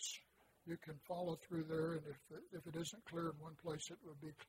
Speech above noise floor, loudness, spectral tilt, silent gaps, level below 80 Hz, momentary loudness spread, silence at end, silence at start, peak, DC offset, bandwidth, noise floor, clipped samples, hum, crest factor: 22 dB; -48 LUFS; -4.5 dB/octave; none; -78 dBFS; 12 LU; 0.05 s; 0 s; -32 dBFS; under 0.1%; 16 kHz; -70 dBFS; under 0.1%; none; 16 dB